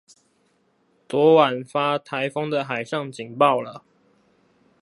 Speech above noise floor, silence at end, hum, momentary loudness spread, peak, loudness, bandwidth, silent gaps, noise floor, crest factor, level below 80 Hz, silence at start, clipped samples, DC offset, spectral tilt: 44 dB; 1.05 s; none; 13 LU; -2 dBFS; -21 LUFS; 11.5 kHz; none; -65 dBFS; 22 dB; -76 dBFS; 1.1 s; under 0.1%; under 0.1%; -6 dB/octave